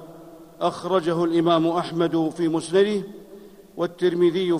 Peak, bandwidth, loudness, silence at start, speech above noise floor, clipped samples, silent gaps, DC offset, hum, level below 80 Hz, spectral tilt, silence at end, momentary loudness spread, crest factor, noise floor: -6 dBFS; 11 kHz; -22 LUFS; 0 s; 24 dB; under 0.1%; none; under 0.1%; none; -64 dBFS; -6.5 dB/octave; 0 s; 12 LU; 16 dB; -45 dBFS